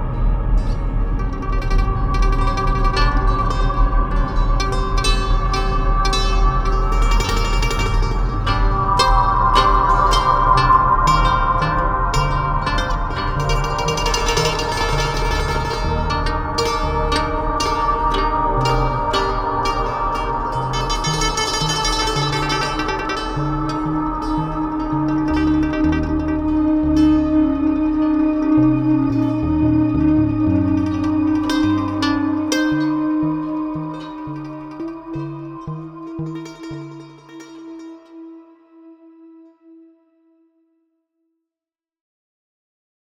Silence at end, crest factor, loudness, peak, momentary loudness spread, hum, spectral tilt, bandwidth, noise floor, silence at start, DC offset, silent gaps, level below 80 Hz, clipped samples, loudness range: 3.95 s; 16 dB; -18 LUFS; -2 dBFS; 14 LU; none; -5.5 dB/octave; 13 kHz; under -90 dBFS; 0 s; under 0.1%; none; -22 dBFS; under 0.1%; 10 LU